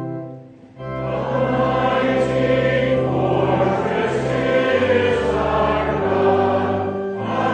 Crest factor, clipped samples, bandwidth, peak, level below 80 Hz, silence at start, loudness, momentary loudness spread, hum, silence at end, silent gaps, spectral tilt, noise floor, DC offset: 14 dB; under 0.1%; 9.4 kHz; -4 dBFS; -40 dBFS; 0 s; -19 LUFS; 8 LU; none; 0 s; none; -7 dB/octave; -39 dBFS; under 0.1%